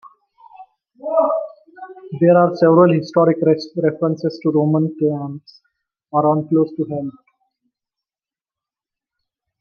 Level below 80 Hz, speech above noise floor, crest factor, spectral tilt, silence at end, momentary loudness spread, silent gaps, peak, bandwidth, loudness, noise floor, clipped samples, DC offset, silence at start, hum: -68 dBFS; over 74 dB; 16 dB; -9 dB/octave; 2.5 s; 19 LU; none; -2 dBFS; 6.6 kHz; -17 LUFS; under -90 dBFS; under 0.1%; under 0.1%; 0.6 s; none